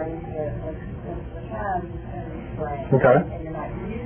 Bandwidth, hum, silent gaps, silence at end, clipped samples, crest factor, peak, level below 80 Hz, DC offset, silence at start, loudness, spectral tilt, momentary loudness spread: 3.4 kHz; none; none; 0 s; under 0.1%; 20 dB; -4 dBFS; -38 dBFS; under 0.1%; 0 s; -26 LUFS; -12 dB/octave; 16 LU